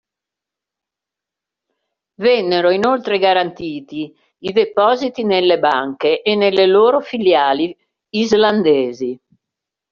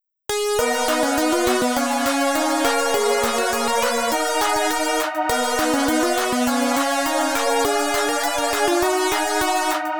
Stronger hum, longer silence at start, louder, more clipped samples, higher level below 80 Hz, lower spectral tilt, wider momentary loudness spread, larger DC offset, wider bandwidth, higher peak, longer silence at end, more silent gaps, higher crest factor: neither; first, 2.2 s vs 0 s; first, -15 LUFS vs -20 LUFS; neither; second, -60 dBFS vs -48 dBFS; about the same, -2.5 dB/octave vs -1.5 dB/octave; first, 13 LU vs 2 LU; second, under 0.1% vs 0.7%; second, 7.2 kHz vs over 20 kHz; first, -2 dBFS vs -6 dBFS; first, 0.75 s vs 0 s; neither; about the same, 16 dB vs 14 dB